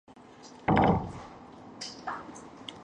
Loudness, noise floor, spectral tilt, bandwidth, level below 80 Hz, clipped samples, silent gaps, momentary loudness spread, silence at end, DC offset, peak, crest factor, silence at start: -30 LUFS; -51 dBFS; -6.5 dB/octave; 10 kHz; -48 dBFS; under 0.1%; none; 24 LU; 0 s; under 0.1%; -8 dBFS; 24 dB; 0.4 s